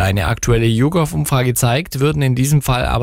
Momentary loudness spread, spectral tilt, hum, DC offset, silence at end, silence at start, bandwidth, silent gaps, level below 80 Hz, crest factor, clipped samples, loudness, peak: 3 LU; -5.5 dB/octave; none; under 0.1%; 0 s; 0 s; 16 kHz; none; -30 dBFS; 12 dB; under 0.1%; -16 LUFS; -4 dBFS